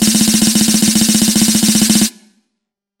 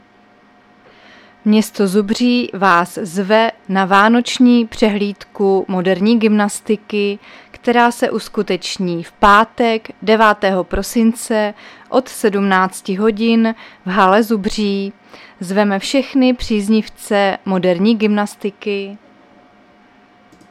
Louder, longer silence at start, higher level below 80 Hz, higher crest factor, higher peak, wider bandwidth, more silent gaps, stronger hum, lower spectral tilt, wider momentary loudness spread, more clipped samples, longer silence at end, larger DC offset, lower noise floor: first, -10 LUFS vs -15 LUFS; second, 0 s vs 1.45 s; about the same, -42 dBFS vs -42 dBFS; about the same, 12 dB vs 16 dB; about the same, 0 dBFS vs 0 dBFS; first, 17 kHz vs 15 kHz; neither; neither; second, -2.5 dB/octave vs -5 dB/octave; second, 1 LU vs 9 LU; neither; second, 0.9 s vs 1.55 s; neither; first, -76 dBFS vs -49 dBFS